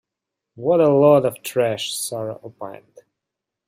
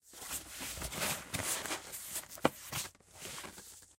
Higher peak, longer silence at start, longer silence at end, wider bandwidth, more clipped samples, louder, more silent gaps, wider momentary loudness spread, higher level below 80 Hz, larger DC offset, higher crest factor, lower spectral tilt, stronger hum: first, -4 dBFS vs -10 dBFS; first, 0.55 s vs 0.05 s; first, 0.95 s vs 0.05 s; about the same, 16 kHz vs 16.5 kHz; neither; first, -19 LUFS vs -39 LUFS; neither; first, 21 LU vs 10 LU; second, -66 dBFS vs -60 dBFS; neither; second, 18 dB vs 30 dB; first, -5 dB/octave vs -2 dB/octave; neither